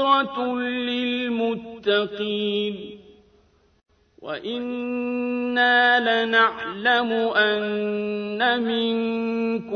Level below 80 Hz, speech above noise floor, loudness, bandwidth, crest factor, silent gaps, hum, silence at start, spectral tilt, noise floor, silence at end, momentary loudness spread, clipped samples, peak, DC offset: -64 dBFS; 37 dB; -22 LUFS; 6.4 kHz; 18 dB; none; none; 0 s; -6 dB/octave; -60 dBFS; 0 s; 11 LU; under 0.1%; -6 dBFS; under 0.1%